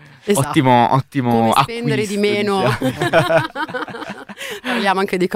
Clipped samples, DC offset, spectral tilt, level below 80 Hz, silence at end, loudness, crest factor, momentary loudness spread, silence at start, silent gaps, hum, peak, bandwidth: under 0.1%; under 0.1%; -5.5 dB/octave; -50 dBFS; 0 s; -17 LUFS; 16 dB; 12 LU; 0.25 s; none; none; 0 dBFS; 16 kHz